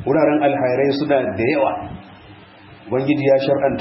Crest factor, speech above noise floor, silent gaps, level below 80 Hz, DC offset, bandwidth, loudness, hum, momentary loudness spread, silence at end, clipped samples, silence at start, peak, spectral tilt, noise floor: 14 dB; 26 dB; none; -52 dBFS; under 0.1%; 5.8 kHz; -18 LUFS; none; 10 LU; 0 s; under 0.1%; 0 s; -4 dBFS; -11 dB/octave; -43 dBFS